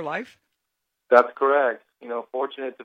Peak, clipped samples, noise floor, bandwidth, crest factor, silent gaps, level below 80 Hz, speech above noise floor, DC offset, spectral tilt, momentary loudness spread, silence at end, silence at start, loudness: -2 dBFS; under 0.1%; -80 dBFS; 7.4 kHz; 22 dB; none; -78 dBFS; 58 dB; under 0.1%; -5.5 dB/octave; 15 LU; 0 s; 0 s; -22 LUFS